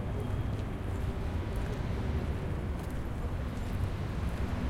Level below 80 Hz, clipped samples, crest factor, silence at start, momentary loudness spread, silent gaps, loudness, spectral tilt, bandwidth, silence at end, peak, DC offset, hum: -38 dBFS; under 0.1%; 12 dB; 0 s; 3 LU; none; -36 LUFS; -7.5 dB/octave; 15.5 kHz; 0 s; -22 dBFS; under 0.1%; none